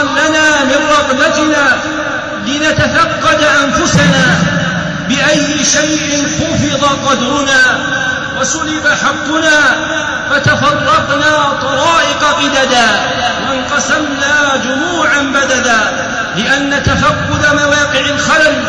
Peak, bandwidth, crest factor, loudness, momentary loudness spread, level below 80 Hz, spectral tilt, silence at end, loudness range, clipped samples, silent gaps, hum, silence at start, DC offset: -2 dBFS; 11 kHz; 10 dB; -10 LUFS; 5 LU; -36 dBFS; -3 dB/octave; 0 s; 1 LU; under 0.1%; none; none; 0 s; 0.2%